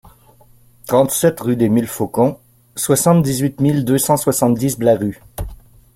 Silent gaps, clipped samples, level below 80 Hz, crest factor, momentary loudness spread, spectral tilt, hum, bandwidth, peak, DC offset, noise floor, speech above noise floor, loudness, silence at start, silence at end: none; under 0.1%; -42 dBFS; 16 dB; 17 LU; -5.5 dB/octave; none; 16.5 kHz; -2 dBFS; under 0.1%; -48 dBFS; 33 dB; -16 LUFS; 0.05 s; 0.4 s